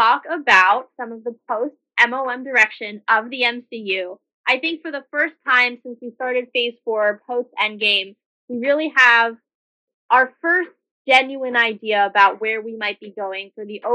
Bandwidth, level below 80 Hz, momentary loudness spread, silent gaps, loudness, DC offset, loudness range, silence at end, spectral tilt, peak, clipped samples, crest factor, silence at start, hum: 11 kHz; -86 dBFS; 16 LU; 4.34-4.44 s, 8.26-8.48 s, 9.55-9.88 s, 9.94-10.09 s, 10.91-11.05 s; -18 LUFS; under 0.1%; 4 LU; 0 s; -2.5 dB/octave; -2 dBFS; under 0.1%; 18 dB; 0 s; none